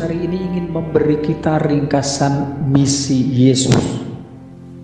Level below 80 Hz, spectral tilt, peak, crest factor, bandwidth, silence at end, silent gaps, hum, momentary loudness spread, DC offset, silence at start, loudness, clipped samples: -42 dBFS; -5.5 dB/octave; 0 dBFS; 16 dB; 10 kHz; 0 s; none; none; 15 LU; under 0.1%; 0 s; -16 LUFS; under 0.1%